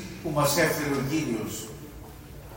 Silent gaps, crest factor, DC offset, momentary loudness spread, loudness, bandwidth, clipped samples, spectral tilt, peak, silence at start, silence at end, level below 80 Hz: none; 18 dB; under 0.1%; 22 LU; -27 LUFS; 16.5 kHz; under 0.1%; -4.5 dB/octave; -10 dBFS; 0 s; 0 s; -50 dBFS